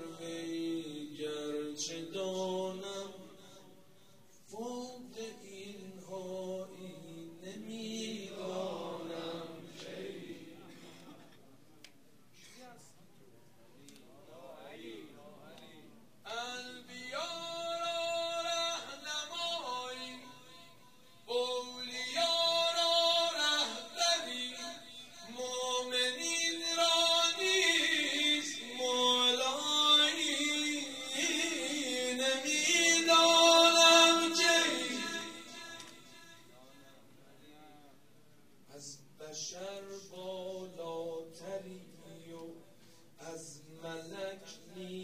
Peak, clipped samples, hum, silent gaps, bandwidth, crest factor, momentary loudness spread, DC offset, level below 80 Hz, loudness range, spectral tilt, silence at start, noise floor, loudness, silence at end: -12 dBFS; under 0.1%; none; none; 15.5 kHz; 24 dB; 23 LU; under 0.1%; -82 dBFS; 22 LU; -1 dB/octave; 0 s; -65 dBFS; -31 LUFS; 0 s